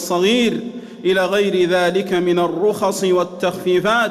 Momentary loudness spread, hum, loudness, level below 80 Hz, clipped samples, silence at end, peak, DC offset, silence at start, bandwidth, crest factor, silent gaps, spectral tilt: 6 LU; none; -17 LUFS; -58 dBFS; under 0.1%; 0 s; -6 dBFS; under 0.1%; 0 s; 14 kHz; 10 dB; none; -4.5 dB/octave